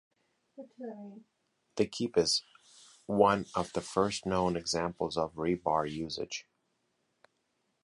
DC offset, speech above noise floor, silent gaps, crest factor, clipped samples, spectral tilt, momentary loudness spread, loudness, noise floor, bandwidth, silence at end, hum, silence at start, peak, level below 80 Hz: under 0.1%; 47 dB; none; 24 dB; under 0.1%; -4.5 dB/octave; 18 LU; -32 LUFS; -79 dBFS; 11.5 kHz; 1.4 s; none; 0.6 s; -10 dBFS; -60 dBFS